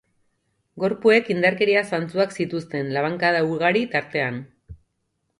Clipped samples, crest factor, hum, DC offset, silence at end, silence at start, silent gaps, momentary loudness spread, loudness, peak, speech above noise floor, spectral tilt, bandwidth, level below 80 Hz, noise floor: under 0.1%; 20 dB; none; under 0.1%; 0.65 s; 0.75 s; none; 9 LU; -21 LUFS; -2 dBFS; 53 dB; -6 dB/octave; 11.5 kHz; -58 dBFS; -74 dBFS